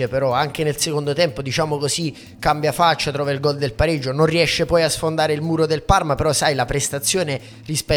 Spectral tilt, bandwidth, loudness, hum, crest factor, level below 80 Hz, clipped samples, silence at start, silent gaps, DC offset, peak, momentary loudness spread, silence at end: -4 dB/octave; 19 kHz; -19 LUFS; none; 20 dB; -38 dBFS; under 0.1%; 0 s; none; under 0.1%; 0 dBFS; 5 LU; 0 s